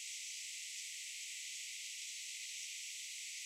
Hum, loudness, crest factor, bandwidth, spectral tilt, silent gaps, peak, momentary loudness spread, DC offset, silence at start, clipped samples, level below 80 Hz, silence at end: none; -44 LUFS; 14 dB; 16 kHz; 10.5 dB/octave; none; -32 dBFS; 1 LU; under 0.1%; 0 s; under 0.1%; under -90 dBFS; 0 s